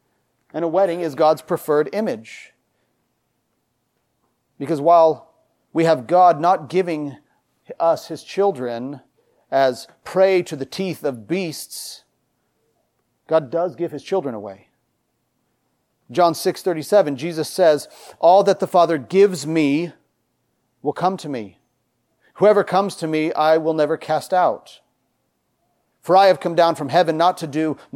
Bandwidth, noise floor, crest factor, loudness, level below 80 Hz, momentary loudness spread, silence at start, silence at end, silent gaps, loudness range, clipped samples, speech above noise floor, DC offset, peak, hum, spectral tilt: 16.5 kHz; -70 dBFS; 16 dB; -19 LUFS; -74 dBFS; 16 LU; 0.55 s; 0.2 s; none; 8 LU; under 0.1%; 52 dB; under 0.1%; -4 dBFS; none; -5.5 dB/octave